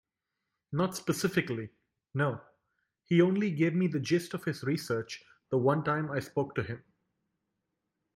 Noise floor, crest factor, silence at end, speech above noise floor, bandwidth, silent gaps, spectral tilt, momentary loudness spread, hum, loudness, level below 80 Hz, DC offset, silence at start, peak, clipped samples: -87 dBFS; 20 dB; 1.35 s; 57 dB; 16 kHz; none; -6.5 dB/octave; 12 LU; none; -31 LUFS; -70 dBFS; under 0.1%; 0.7 s; -12 dBFS; under 0.1%